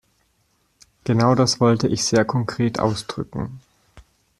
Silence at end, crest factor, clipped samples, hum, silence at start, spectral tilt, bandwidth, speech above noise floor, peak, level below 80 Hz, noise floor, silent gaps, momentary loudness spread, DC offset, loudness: 0.4 s; 18 dB; under 0.1%; none; 1.05 s; -5.5 dB/octave; 12.5 kHz; 46 dB; -2 dBFS; -52 dBFS; -65 dBFS; none; 13 LU; under 0.1%; -20 LUFS